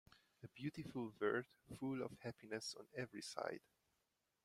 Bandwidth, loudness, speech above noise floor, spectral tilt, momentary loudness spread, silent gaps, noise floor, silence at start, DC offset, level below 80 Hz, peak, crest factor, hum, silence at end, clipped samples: 15.5 kHz; -48 LUFS; 40 dB; -5 dB/octave; 13 LU; none; -87 dBFS; 0.1 s; under 0.1%; -80 dBFS; -26 dBFS; 22 dB; none; 0.85 s; under 0.1%